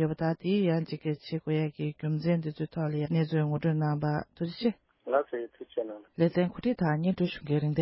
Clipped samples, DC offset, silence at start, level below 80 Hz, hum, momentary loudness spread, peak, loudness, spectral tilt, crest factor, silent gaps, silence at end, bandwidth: under 0.1%; under 0.1%; 0 s; -62 dBFS; none; 9 LU; -14 dBFS; -30 LUFS; -11.5 dB/octave; 16 dB; none; 0 s; 5.8 kHz